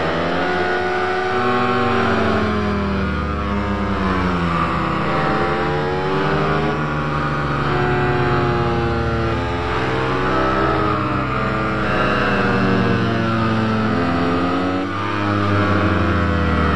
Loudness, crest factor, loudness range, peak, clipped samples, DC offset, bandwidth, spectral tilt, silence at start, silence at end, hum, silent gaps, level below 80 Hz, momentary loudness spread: -19 LUFS; 12 dB; 1 LU; -6 dBFS; under 0.1%; 3%; 11 kHz; -7 dB/octave; 0 s; 0 s; none; none; -32 dBFS; 4 LU